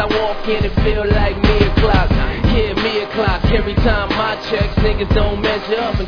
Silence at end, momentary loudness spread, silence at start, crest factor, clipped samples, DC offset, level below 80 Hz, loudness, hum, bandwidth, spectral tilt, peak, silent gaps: 0 s; 4 LU; 0 s; 14 dB; under 0.1%; under 0.1%; -20 dBFS; -16 LUFS; none; 5.4 kHz; -7.5 dB/octave; 0 dBFS; none